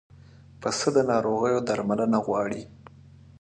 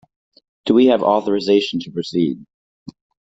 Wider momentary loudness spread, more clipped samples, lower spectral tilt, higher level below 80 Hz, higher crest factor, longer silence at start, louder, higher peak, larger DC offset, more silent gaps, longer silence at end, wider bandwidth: about the same, 10 LU vs 11 LU; neither; second, -5 dB/octave vs -6.5 dB/octave; about the same, -60 dBFS vs -60 dBFS; about the same, 18 dB vs 16 dB; about the same, 0.6 s vs 0.65 s; second, -25 LUFS vs -17 LUFS; second, -10 dBFS vs -2 dBFS; neither; second, none vs 2.54-2.86 s; first, 0.7 s vs 0.4 s; first, 10.5 kHz vs 7.8 kHz